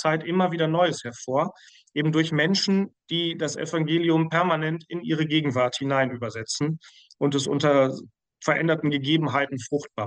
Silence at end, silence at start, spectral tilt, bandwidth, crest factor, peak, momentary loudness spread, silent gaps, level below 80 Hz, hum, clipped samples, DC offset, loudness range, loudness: 0 s; 0 s; -5 dB/octave; 9.8 kHz; 14 dB; -10 dBFS; 8 LU; none; -70 dBFS; none; under 0.1%; under 0.1%; 1 LU; -24 LUFS